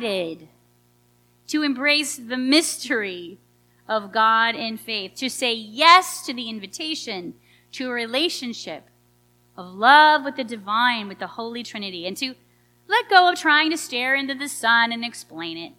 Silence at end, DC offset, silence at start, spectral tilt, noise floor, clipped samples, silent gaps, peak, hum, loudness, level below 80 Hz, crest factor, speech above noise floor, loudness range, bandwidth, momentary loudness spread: 0.1 s; under 0.1%; 0 s; -1.5 dB/octave; -60 dBFS; under 0.1%; none; 0 dBFS; 60 Hz at -55 dBFS; -20 LUFS; -72 dBFS; 22 dB; 39 dB; 3 LU; 18 kHz; 17 LU